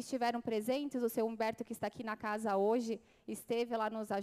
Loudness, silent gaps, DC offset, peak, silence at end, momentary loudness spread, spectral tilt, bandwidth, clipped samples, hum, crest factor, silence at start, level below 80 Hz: -37 LUFS; none; under 0.1%; -22 dBFS; 0 s; 8 LU; -5 dB/octave; 15.5 kHz; under 0.1%; none; 14 dB; 0 s; -76 dBFS